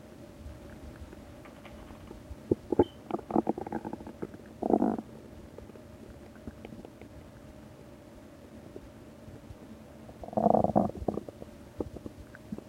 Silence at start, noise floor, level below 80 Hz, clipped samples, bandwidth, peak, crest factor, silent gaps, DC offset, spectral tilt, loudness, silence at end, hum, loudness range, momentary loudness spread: 0 s; -50 dBFS; -54 dBFS; under 0.1%; 16 kHz; -8 dBFS; 28 dB; none; under 0.1%; -8.5 dB/octave; -32 LUFS; 0 s; none; 17 LU; 22 LU